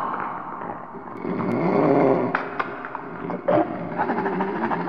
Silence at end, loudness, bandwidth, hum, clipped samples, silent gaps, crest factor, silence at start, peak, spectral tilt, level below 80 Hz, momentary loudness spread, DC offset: 0 s; -24 LUFS; 6.4 kHz; none; under 0.1%; none; 18 dB; 0 s; -6 dBFS; -9.5 dB/octave; -60 dBFS; 14 LU; 0.4%